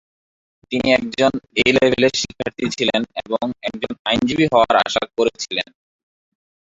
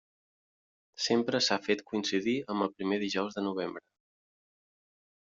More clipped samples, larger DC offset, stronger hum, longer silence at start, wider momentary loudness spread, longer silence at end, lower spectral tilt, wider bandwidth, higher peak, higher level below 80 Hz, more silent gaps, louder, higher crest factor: neither; neither; neither; second, 0.7 s vs 1 s; first, 10 LU vs 7 LU; second, 1.15 s vs 1.6 s; about the same, -4 dB/octave vs -4 dB/octave; about the same, 8 kHz vs 7.8 kHz; first, 0 dBFS vs -14 dBFS; first, -50 dBFS vs -76 dBFS; first, 3.99-4.05 s vs none; first, -18 LUFS vs -31 LUFS; about the same, 18 dB vs 20 dB